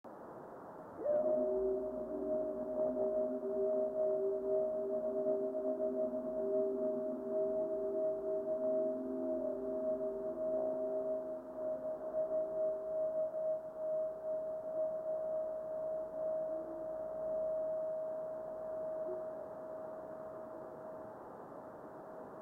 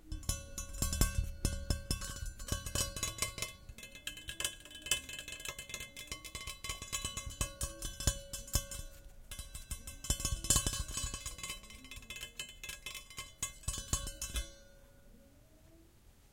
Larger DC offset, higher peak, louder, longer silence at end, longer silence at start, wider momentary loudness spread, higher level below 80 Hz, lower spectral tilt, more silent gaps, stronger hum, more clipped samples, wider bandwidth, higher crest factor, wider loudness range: neither; second, -24 dBFS vs -12 dBFS; about the same, -38 LUFS vs -39 LUFS; about the same, 0 s vs 0.05 s; about the same, 0.05 s vs 0.05 s; about the same, 13 LU vs 12 LU; second, -72 dBFS vs -46 dBFS; first, -9 dB/octave vs -2 dB/octave; neither; neither; neither; second, 2.1 kHz vs 17 kHz; second, 14 dB vs 28 dB; about the same, 6 LU vs 5 LU